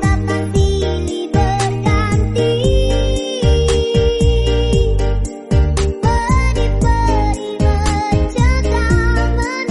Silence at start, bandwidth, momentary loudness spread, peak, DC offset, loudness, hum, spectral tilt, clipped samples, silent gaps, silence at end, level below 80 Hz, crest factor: 0 s; 11.5 kHz; 4 LU; -2 dBFS; under 0.1%; -16 LUFS; none; -6 dB/octave; under 0.1%; none; 0 s; -18 dBFS; 12 dB